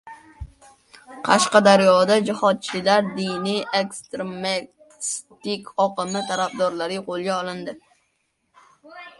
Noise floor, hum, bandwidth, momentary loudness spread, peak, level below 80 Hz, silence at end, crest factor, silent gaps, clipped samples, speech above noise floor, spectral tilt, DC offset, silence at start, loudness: -71 dBFS; none; 11.5 kHz; 16 LU; 0 dBFS; -54 dBFS; 0.1 s; 22 dB; none; under 0.1%; 50 dB; -4 dB/octave; under 0.1%; 0.05 s; -21 LUFS